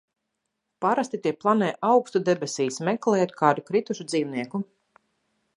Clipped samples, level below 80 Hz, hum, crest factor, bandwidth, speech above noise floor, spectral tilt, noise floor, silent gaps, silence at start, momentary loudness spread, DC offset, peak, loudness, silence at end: under 0.1%; -76 dBFS; none; 22 dB; 11.5 kHz; 56 dB; -5.5 dB/octave; -80 dBFS; none; 0.8 s; 8 LU; under 0.1%; -4 dBFS; -25 LUFS; 0.95 s